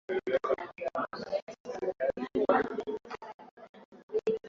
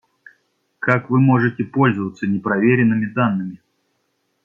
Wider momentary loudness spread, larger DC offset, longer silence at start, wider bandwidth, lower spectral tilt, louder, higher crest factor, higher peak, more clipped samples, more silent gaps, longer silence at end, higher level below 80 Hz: first, 17 LU vs 8 LU; neither; second, 0.1 s vs 0.8 s; about the same, 7.4 kHz vs 7 kHz; second, -6 dB/octave vs -9.5 dB/octave; second, -33 LUFS vs -18 LUFS; first, 24 dB vs 18 dB; second, -10 dBFS vs -2 dBFS; neither; first, 1.42-1.47 s, 1.60-1.65 s, 3.34-3.39 s, 3.51-3.57 s, 3.69-3.74 s, 3.85-3.92 s, 4.03-4.08 s vs none; second, 0 s vs 0.9 s; second, -68 dBFS vs -60 dBFS